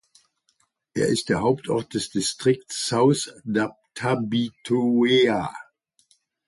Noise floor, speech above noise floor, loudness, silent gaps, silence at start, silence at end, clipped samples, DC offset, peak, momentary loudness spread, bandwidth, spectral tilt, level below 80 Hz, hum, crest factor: -69 dBFS; 47 dB; -23 LUFS; none; 0.95 s; 0.85 s; under 0.1%; under 0.1%; -8 dBFS; 9 LU; 11.5 kHz; -4.5 dB/octave; -58 dBFS; none; 16 dB